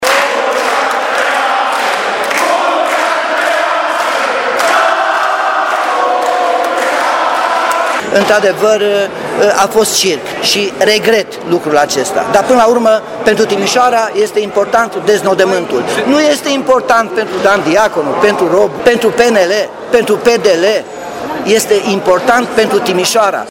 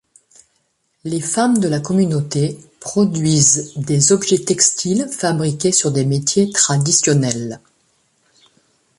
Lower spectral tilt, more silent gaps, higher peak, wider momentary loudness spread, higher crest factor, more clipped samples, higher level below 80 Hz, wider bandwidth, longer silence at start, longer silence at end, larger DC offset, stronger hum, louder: about the same, -3 dB/octave vs -4 dB/octave; neither; about the same, 0 dBFS vs 0 dBFS; second, 4 LU vs 10 LU; second, 10 dB vs 16 dB; first, 0.2% vs under 0.1%; first, -50 dBFS vs -56 dBFS; first, 17 kHz vs 11.5 kHz; second, 0 s vs 1.05 s; second, 0 s vs 1.4 s; neither; neither; first, -11 LUFS vs -16 LUFS